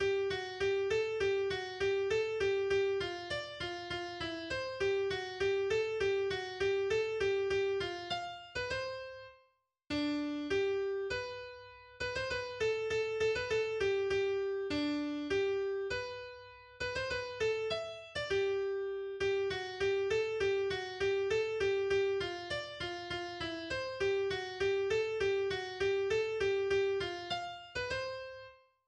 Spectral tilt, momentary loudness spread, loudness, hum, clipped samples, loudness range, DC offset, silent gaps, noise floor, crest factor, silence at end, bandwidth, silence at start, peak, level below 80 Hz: -4.5 dB/octave; 8 LU; -35 LUFS; none; under 0.1%; 3 LU; under 0.1%; none; -74 dBFS; 12 dB; 0.35 s; 9.4 kHz; 0 s; -22 dBFS; -60 dBFS